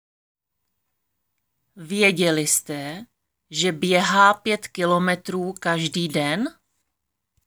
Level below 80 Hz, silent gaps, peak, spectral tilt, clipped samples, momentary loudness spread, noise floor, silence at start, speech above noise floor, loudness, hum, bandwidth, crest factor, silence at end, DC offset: -70 dBFS; none; -4 dBFS; -3.5 dB/octave; under 0.1%; 14 LU; -80 dBFS; 1.75 s; 59 dB; -21 LUFS; none; over 20 kHz; 20 dB; 0.95 s; under 0.1%